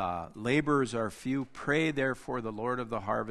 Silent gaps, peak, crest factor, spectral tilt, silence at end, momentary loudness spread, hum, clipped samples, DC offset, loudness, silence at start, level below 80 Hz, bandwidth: none; -14 dBFS; 18 dB; -6 dB/octave; 0 s; 8 LU; none; under 0.1%; under 0.1%; -31 LUFS; 0 s; -58 dBFS; 12.5 kHz